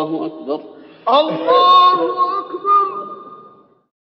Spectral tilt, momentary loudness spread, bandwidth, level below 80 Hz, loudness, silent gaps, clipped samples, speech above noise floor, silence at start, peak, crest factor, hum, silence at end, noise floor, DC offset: -6 dB/octave; 17 LU; 6.2 kHz; -72 dBFS; -15 LUFS; none; under 0.1%; 32 dB; 0 s; -2 dBFS; 14 dB; none; 0.85 s; -46 dBFS; under 0.1%